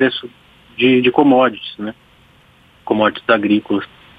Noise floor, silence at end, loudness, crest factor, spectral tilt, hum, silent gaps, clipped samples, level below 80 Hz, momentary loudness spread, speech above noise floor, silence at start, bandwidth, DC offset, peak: -50 dBFS; 0.35 s; -15 LUFS; 16 dB; -7.5 dB/octave; none; none; under 0.1%; -58 dBFS; 17 LU; 35 dB; 0 s; 4.9 kHz; under 0.1%; 0 dBFS